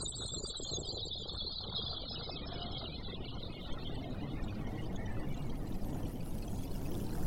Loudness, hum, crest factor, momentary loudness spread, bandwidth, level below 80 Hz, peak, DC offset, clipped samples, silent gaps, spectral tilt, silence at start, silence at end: -41 LUFS; none; 14 dB; 5 LU; 16 kHz; -44 dBFS; -24 dBFS; 0.2%; under 0.1%; none; -4.5 dB/octave; 0 s; 0 s